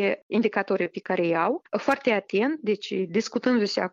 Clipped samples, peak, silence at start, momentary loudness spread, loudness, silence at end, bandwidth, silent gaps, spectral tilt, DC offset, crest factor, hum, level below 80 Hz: under 0.1%; -8 dBFS; 0 s; 4 LU; -25 LUFS; 0.05 s; 8.6 kHz; 0.22-0.30 s; -5.5 dB/octave; under 0.1%; 18 dB; none; -72 dBFS